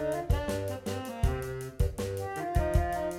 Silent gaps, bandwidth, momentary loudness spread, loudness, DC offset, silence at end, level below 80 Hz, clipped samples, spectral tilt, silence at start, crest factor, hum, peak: none; 16.5 kHz; 7 LU; -32 LUFS; under 0.1%; 0 s; -34 dBFS; under 0.1%; -6.5 dB/octave; 0 s; 18 dB; none; -12 dBFS